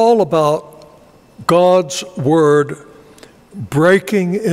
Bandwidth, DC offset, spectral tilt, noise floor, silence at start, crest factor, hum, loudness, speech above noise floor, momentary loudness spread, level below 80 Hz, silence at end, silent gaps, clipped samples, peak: 15.5 kHz; under 0.1%; -6 dB/octave; -45 dBFS; 0 s; 14 dB; none; -14 LUFS; 32 dB; 11 LU; -54 dBFS; 0 s; none; under 0.1%; -2 dBFS